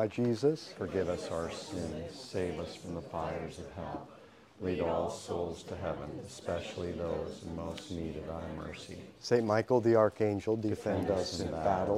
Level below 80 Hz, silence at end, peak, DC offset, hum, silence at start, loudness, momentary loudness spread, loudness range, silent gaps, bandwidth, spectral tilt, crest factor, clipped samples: -56 dBFS; 0 s; -12 dBFS; under 0.1%; none; 0 s; -35 LUFS; 13 LU; 8 LU; none; 14 kHz; -6 dB/octave; 22 dB; under 0.1%